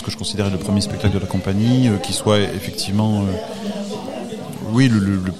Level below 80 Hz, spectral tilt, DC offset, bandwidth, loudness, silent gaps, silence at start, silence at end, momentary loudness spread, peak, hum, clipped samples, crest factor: -46 dBFS; -6 dB/octave; 1%; 14 kHz; -20 LUFS; none; 0 s; 0 s; 12 LU; -2 dBFS; none; under 0.1%; 18 dB